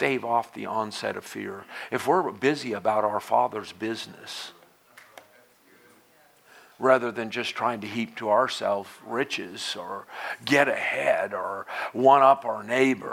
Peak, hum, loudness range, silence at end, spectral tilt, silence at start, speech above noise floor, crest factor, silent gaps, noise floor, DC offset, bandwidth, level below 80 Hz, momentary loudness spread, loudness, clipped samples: -4 dBFS; none; 8 LU; 0 s; -4.5 dB/octave; 0 s; 33 dB; 22 dB; none; -59 dBFS; under 0.1%; 16.5 kHz; -78 dBFS; 14 LU; -25 LUFS; under 0.1%